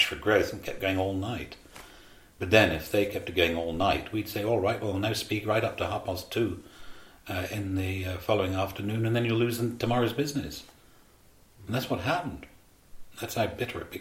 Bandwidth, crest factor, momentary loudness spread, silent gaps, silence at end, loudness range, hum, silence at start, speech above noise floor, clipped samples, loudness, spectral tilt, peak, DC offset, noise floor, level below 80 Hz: 16.5 kHz; 24 dB; 13 LU; none; 0 s; 6 LU; none; 0 s; 29 dB; under 0.1%; -29 LUFS; -5.5 dB/octave; -6 dBFS; under 0.1%; -58 dBFS; -52 dBFS